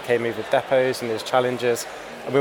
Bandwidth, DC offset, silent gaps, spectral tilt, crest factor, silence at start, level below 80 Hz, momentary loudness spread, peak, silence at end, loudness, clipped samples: 19 kHz; under 0.1%; none; -4.5 dB/octave; 18 dB; 0 s; -62 dBFS; 7 LU; -4 dBFS; 0 s; -23 LUFS; under 0.1%